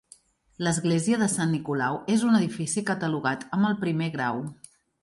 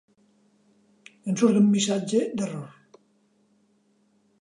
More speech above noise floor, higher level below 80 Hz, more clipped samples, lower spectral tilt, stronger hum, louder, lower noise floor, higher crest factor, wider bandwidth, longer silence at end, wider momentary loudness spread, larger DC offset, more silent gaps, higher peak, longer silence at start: second, 32 dB vs 43 dB; first, -64 dBFS vs -76 dBFS; neither; about the same, -5 dB/octave vs -5.5 dB/octave; neither; about the same, -26 LUFS vs -24 LUFS; second, -57 dBFS vs -66 dBFS; about the same, 16 dB vs 18 dB; about the same, 11.5 kHz vs 11 kHz; second, 0.5 s vs 1.75 s; second, 6 LU vs 18 LU; neither; neither; about the same, -10 dBFS vs -10 dBFS; second, 0.6 s vs 1.25 s